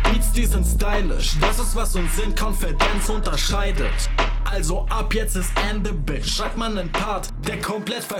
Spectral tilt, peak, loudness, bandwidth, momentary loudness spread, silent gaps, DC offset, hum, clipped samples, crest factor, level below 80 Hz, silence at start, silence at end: -4 dB/octave; -4 dBFS; -23 LUFS; 16.5 kHz; 5 LU; none; under 0.1%; none; under 0.1%; 16 dB; -22 dBFS; 0 s; 0 s